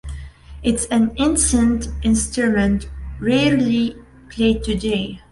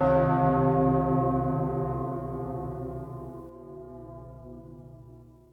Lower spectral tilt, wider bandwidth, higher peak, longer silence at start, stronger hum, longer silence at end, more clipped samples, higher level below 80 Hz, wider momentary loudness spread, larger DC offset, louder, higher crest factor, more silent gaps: second, -4.5 dB/octave vs -11 dB/octave; first, 11.5 kHz vs 4.1 kHz; first, -4 dBFS vs -10 dBFS; about the same, 0.05 s vs 0 s; neither; about the same, 0.15 s vs 0.2 s; neither; first, -32 dBFS vs -46 dBFS; second, 9 LU vs 22 LU; neither; first, -19 LUFS vs -27 LUFS; about the same, 14 dB vs 18 dB; neither